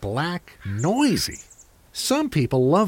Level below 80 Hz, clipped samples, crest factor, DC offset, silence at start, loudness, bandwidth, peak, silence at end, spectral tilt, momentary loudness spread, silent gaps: -48 dBFS; under 0.1%; 16 dB; under 0.1%; 0 s; -23 LUFS; 17 kHz; -8 dBFS; 0 s; -5 dB/octave; 12 LU; none